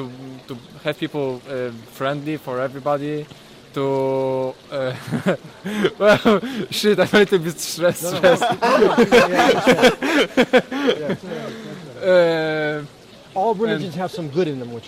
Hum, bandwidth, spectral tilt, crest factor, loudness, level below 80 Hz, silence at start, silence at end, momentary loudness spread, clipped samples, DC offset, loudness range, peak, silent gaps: none; 16 kHz; -5 dB/octave; 16 dB; -19 LUFS; -54 dBFS; 0 s; 0 s; 15 LU; under 0.1%; under 0.1%; 9 LU; -4 dBFS; none